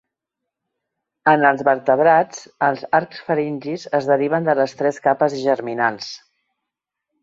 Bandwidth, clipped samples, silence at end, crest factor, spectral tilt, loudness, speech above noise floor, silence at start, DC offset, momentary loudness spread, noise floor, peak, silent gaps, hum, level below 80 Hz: 7.8 kHz; under 0.1%; 1.05 s; 18 dB; -5.5 dB/octave; -19 LUFS; 64 dB; 1.25 s; under 0.1%; 10 LU; -82 dBFS; -2 dBFS; none; none; -66 dBFS